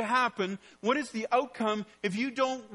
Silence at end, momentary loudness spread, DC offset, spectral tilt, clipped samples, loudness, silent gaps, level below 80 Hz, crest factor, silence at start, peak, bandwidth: 0 s; 7 LU; under 0.1%; -4.5 dB/octave; under 0.1%; -31 LUFS; none; -76 dBFS; 18 dB; 0 s; -14 dBFS; 11.5 kHz